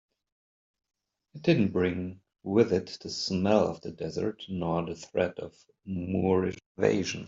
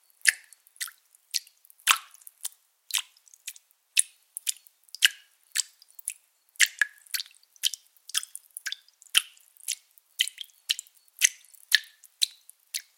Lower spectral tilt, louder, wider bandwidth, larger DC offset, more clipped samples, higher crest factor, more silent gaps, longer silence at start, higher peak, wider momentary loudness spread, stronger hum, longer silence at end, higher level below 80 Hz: first, -6 dB/octave vs 6.5 dB/octave; about the same, -29 LUFS vs -28 LUFS; second, 7.8 kHz vs 17 kHz; neither; neither; second, 22 dB vs 32 dB; first, 6.66-6.75 s vs none; first, 1.35 s vs 0.25 s; second, -8 dBFS vs 0 dBFS; second, 12 LU vs 18 LU; neither; second, 0 s vs 0.15 s; first, -64 dBFS vs -88 dBFS